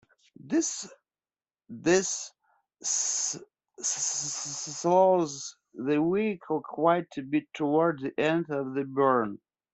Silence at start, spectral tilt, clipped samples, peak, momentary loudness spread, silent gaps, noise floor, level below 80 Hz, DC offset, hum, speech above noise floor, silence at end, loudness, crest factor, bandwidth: 0.45 s; -3.5 dB/octave; under 0.1%; -10 dBFS; 11 LU; none; under -90 dBFS; -72 dBFS; under 0.1%; none; over 62 dB; 0.35 s; -28 LUFS; 20 dB; 8.4 kHz